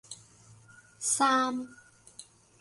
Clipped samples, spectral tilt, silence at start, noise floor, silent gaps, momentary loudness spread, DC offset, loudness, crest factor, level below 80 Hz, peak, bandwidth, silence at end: under 0.1%; -1.5 dB/octave; 0.1 s; -57 dBFS; none; 25 LU; under 0.1%; -28 LUFS; 20 dB; -74 dBFS; -12 dBFS; 12 kHz; 0.4 s